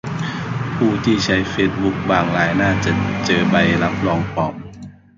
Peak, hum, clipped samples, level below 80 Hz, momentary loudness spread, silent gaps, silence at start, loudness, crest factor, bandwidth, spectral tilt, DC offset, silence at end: 0 dBFS; none; under 0.1%; -40 dBFS; 9 LU; none; 0.05 s; -18 LUFS; 18 dB; 7.6 kHz; -6 dB/octave; under 0.1%; 0.25 s